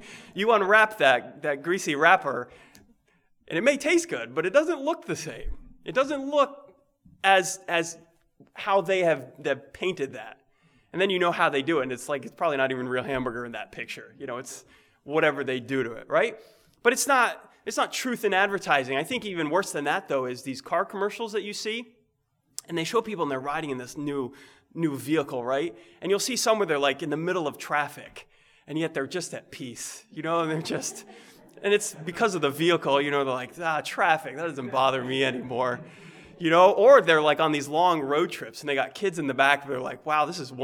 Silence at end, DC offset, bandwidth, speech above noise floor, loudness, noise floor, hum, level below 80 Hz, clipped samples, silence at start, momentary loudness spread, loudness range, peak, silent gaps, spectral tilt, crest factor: 0 s; under 0.1%; 19 kHz; 46 dB; -25 LUFS; -72 dBFS; none; -56 dBFS; under 0.1%; 0 s; 15 LU; 9 LU; -4 dBFS; none; -3.5 dB/octave; 22 dB